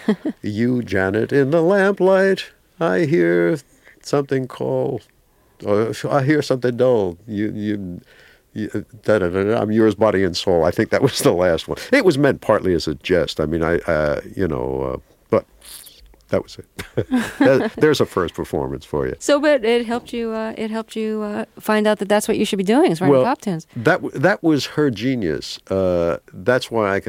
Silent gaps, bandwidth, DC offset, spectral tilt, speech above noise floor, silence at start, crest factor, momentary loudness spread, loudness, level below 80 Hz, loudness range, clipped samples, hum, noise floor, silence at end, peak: none; 16.5 kHz; under 0.1%; -6 dB/octave; 27 dB; 0 s; 18 dB; 10 LU; -19 LUFS; -46 dBFS; 4 LU; under 0.1%; none; -46 dBFS; 0.05 s; -2 dBFS